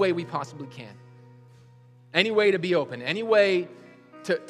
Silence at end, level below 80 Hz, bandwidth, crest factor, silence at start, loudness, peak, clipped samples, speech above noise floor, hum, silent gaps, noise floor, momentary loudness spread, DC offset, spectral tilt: 0 s; -78 dBFS; 11.5 kHz; 22 dB; 0 s; -24 LUFS; -4 dBFS; under 0.1%; 29 dB; none; none; -53 dBFS; 20 LU; under 0.1%; -5.5 dB/octave